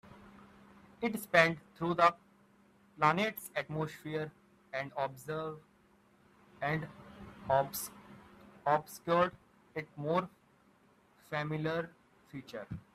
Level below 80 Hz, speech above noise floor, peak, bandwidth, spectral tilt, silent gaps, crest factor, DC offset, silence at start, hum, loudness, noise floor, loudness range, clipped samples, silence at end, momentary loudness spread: -68 dBFS; 33 dB; -10 dBFS; 15.5 kHz; -5 dB/octave; none; 26 dB; under 0.1%; 0.1 s; none; -34 LUFS; -67 dBFS; 9 LU; under 0.1%; 0.15 s; 19 LU